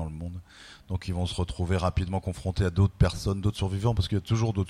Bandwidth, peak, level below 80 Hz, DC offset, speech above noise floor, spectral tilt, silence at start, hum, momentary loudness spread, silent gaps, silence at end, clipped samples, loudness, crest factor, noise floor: 12.5 kHz; -8 dBFS; -38 dBFS; under 0.1%; 23 dB; -6.5 dB/octave; 0 s; none; 13 LU; none; 0 s; under 0.1%; -28 LUFS; 18 dB; -49 dBFS